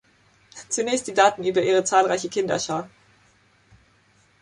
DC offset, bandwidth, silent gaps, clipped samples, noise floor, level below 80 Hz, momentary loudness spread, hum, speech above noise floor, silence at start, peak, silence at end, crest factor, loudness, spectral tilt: under 0.1%; 11.5 kHz; none; under 0.1%; -60 dBFS; -64 dBFS; 11 LU; none; 39 dB; 0.55 s; -4 dBFS; 1.55 s; 20 dB; -22 LUFS; -3 dB/octave